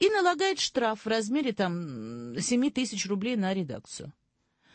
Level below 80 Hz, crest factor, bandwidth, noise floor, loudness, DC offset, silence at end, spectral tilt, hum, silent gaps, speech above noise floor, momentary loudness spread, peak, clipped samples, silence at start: -68 dBFS; 18 dB; 8.8 kHz; -70 dBFS; -29 LUFS; under 0.1%; 0.65 s; -4 dB/octave; none; none; 41 dB; 13 LU; -12 dBFS; under 0.1%; 0 s